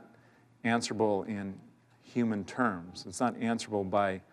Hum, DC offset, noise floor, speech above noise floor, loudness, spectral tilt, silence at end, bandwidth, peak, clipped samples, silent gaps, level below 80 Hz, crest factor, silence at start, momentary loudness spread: none; under 0.1%; -62 dBFS; 30 dB; -32 LUFS; -5 dB/octave; 0.1 s; 12 kHz; -16 dBFS; under 0.1%; none; -74 dBFS; 18 dB; 0 s; 10 LU